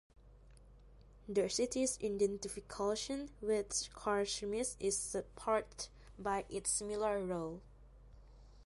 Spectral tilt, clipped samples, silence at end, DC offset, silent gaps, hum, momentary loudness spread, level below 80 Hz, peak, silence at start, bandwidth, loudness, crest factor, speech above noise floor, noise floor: -3 dB/octave; under 0.1%; 0 s; under 0.1%; none; none; 9 LU; -60 dBFS; -22 dBFS; 0.2 s; 11.5 kHz; -38 LUFS; 18 dB; 22 dB; -60 dBFS